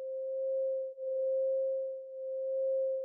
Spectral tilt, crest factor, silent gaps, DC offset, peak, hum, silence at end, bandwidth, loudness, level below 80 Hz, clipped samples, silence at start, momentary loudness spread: -2.5 dB/octave; 6 dB; none; under 0.1%; -28 dBFS; none; 0 s; 0.6 kHz; -35 LUFS; under -90 dBFS; under 0.1%; 0 s; 7 LU